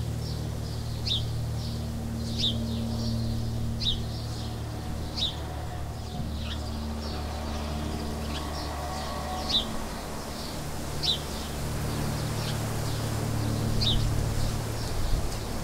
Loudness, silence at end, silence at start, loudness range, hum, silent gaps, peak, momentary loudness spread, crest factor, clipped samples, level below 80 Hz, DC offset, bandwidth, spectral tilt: -31 LUFS; 0 s; 0 s; 4 LU; none; none; -12 dBFS; 8 LU; 18 dB; under 0.1%; -36 dBFS; under 0.1%; 16 kHz; -5 dB/octave